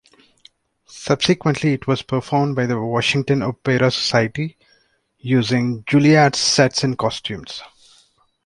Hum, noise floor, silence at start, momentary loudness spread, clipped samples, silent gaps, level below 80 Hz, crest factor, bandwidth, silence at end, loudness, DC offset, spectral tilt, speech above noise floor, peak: none; -61 dBFS; 0.9 s; 14 LU; under 0.1%; none; -54 dBFS; 18 dB; 11.5 kHz; 0.8 s; -18 LUFS; under 0.1%; -5 dB/octave; 43 dB; -2 dBFS